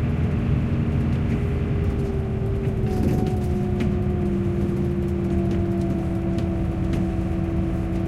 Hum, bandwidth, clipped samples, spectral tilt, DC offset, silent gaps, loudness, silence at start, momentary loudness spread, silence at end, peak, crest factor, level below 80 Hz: none; 12.5 kHz; under 0.1%; -9 dB/octave; under 0.1%; none; -24 LUFS; 0 s; 2 LU; 0 s; -8 dBFS; 14 dB; -32 dBFS